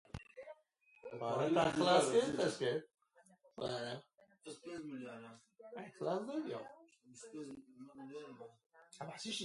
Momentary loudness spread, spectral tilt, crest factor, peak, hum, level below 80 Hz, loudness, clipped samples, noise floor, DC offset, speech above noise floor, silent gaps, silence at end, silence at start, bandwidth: 24 LU; -4.5 dB/octave; 22 dB; -18 dBFS; none; -72 dBFS; -38 LUFS; under 0.1%; -71 dBFS; under 0.1%; 32 dB; none; 0 s; 0.15 s; 11.5 kHz